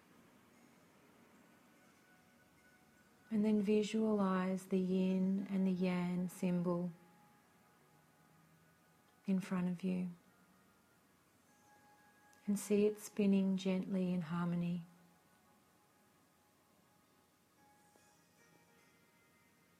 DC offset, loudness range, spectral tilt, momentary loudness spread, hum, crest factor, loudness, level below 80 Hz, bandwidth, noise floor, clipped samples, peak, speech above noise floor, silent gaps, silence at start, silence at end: under 0.1%; 9 LU; -7.5 dB/octave; 8 LU; none; 16 dB; -37 LUFS; -80 dBFS; 14 kHz; -72 dBFS; under 0.1%; -24 dBFS; 36 dB; none; 3.3 s; 4.95 s